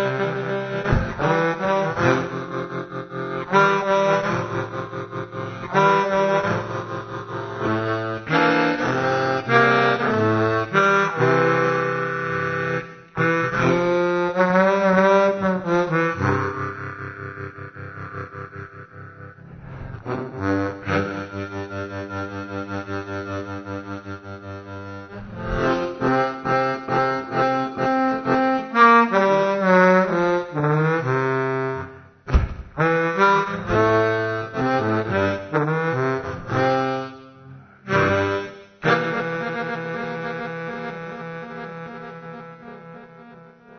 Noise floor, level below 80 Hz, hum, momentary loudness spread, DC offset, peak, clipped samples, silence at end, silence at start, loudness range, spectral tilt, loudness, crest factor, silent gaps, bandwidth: -45 dBFS; -40 dBFS; none; 18 LU; under 0.1%; -2 dBFS; under 0.1%; 0 s; 0 s; 12 LU; -6.5 dB/octave; -21 LUFS; 20 dB; none; 6.6 kHz